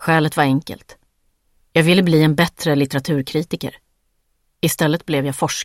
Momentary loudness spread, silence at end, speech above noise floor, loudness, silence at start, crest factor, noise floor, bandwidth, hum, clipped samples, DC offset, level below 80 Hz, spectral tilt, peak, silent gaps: 12 LU; 0 s; 49 dB; -18 LUFS; 0 s; 18 dB; -66 dBFS; 16.5 kHz; none; under 0.1%; under 0.1%; -52 dBFS; -5.5 dB/octave; 0 dBFS; none